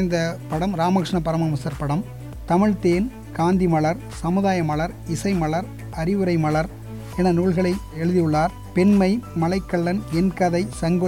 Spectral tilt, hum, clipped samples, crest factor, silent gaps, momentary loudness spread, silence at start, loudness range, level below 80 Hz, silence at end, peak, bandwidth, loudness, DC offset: -7 dB/octave; none; under 0.1%; 14 dB; none; 8 LU; 0 s; 2 LU; -40 dBFS; 0 s; -8 dBFS; 16 kHz; -22 LUFS; 0.3%